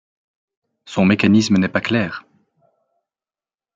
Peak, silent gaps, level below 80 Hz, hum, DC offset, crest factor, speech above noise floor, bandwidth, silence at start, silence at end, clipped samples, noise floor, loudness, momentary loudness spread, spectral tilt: -2 dBFS; none; -60 dBFS; none; under 0.1%; 18 dB; over 74 dB; 7.8 kHz; 0.9 s; 1.55 s; under 0.1%; under -90 dBFS; -17 LUFS; 13 LU; -6 dB/octave